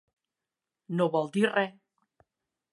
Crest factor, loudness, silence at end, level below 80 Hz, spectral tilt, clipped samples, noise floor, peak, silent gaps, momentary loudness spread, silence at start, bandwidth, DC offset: 20 dB; -28 LUFS; 1 s; -82 dBFS; -6.5 dB/octave; under 0.1%; -89 dBFS; -12 dBFS; none; 9 LU; 0.9 s; 11.5 kHz; under 0.1%